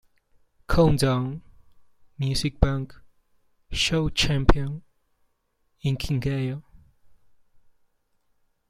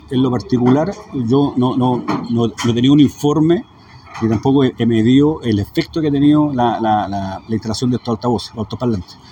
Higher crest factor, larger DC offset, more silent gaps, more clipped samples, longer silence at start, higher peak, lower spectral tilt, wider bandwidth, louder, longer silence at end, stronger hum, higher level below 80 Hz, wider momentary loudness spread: first, 24 dB vs 16 dB; neither; neither; neither; first, 0.7 s vs 0.1 s; about the same, -2 dBFS vs 0 dBFS; second, -5.5 dB/octave vs -7 dB/octave; second, 15.5 kHz vs 18.5 kHz; second, -25 LUFS vs -16 LUFS; first, 1.95 s vs 0.2 s; neither; first, -34 dBFS vs -44 dBFS; first, 13 LU vs 10 LU